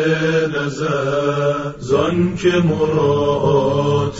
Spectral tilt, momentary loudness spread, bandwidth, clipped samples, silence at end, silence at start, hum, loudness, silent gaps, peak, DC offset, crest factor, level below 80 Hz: -6.5 dB/octave; 5 LU; 7.8 kHz; under 0.1%; 0 s; 0 s; none; -17 LUFS; none; -4 dBFS; under 0.1%; 12 dB; -44 dBFS